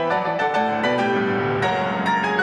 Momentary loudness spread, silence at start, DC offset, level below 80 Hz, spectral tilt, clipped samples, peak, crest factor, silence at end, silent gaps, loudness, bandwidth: 1 LU; 0 s; under 0.1%; -58 dBFS; -6 dB/octave; under 0.1%; -8 dBFS; 12 dB; 0 s; none; -21 LUFS; 10.5 kHz